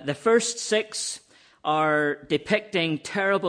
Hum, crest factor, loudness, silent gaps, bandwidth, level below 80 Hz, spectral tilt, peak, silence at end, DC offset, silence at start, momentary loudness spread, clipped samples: none; 16 dB; -25 LUFS; none; 10.5 kHz; -66 dBFS; -3.5 dB/octave; -8 dBFS; 0 s; under 0.1%; 0 s; 8 LU; under 0.1%